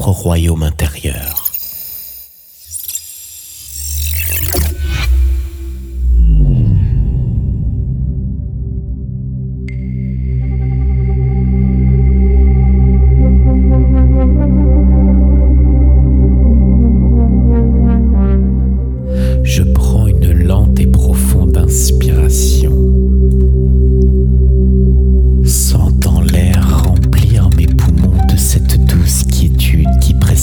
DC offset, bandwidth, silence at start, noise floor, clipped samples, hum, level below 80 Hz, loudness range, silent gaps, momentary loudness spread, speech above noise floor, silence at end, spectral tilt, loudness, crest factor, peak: under 0.1%; over 20 kHz; 0 s; -37 dBFS; under 0.1%; none; -12 dBFS; 8 LU; none; 11 LU; 23 dB; 0 s; -6.5 dB/octave; -12 LUFS; 8 dB; 0 dBFS